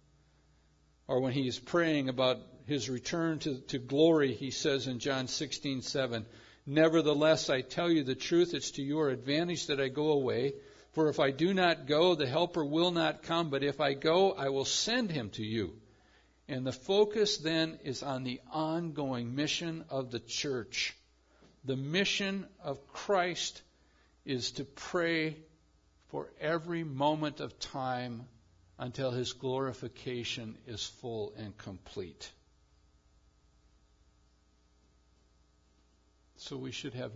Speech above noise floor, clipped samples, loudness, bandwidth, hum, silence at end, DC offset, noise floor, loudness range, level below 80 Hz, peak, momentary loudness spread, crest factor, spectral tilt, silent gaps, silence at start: 36 dB; under 0.1%; -32 LUFS; 7.8 kHz; none; 0 s; under 0.1%; -68 dBFS; 9 LU; -66 dBFS; -14 dBFS; 14 LU; 20 dB; -4.5 dB/octave; none; 1.1 s